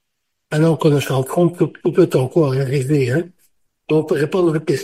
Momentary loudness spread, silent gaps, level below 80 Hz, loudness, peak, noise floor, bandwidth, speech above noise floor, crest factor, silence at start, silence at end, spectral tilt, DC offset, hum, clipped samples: 5 LU; none; -56 dBFS; -17 LUFS; -2 dBFS; -76 dBFS; 15.5 kHz; 60 dB; 16 dB; 0.5 s; 0 s; -7 dB/octave; under 0.1%; none; under 0.1%